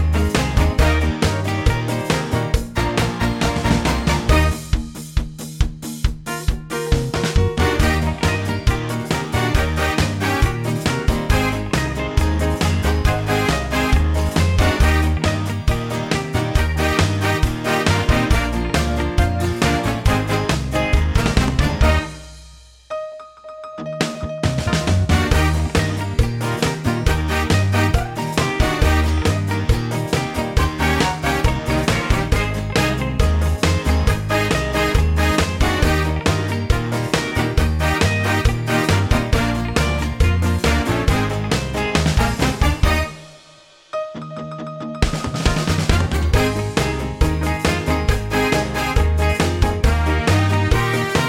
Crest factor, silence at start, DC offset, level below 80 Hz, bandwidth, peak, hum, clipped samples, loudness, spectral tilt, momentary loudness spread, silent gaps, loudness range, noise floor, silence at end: 14 dB; 0 s; under 0.1%; -22 dBFS; 16.5 kHz; -4 dBFS; none; under 0.1%; -19 LUFS; -5.5 dB/octave; 6 LU; none; 3 LU; -47 dBFS; 0 s